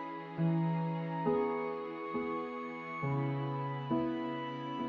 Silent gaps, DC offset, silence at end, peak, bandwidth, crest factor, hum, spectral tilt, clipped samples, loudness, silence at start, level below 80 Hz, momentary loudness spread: none; under 0.1%; 0 s; -20 dBFS; 4.9 kHz; 16 dB; none; -7 dB/octave; under 0.1%; -36 LUFS; 0 s; -70 dBFS; 7 LU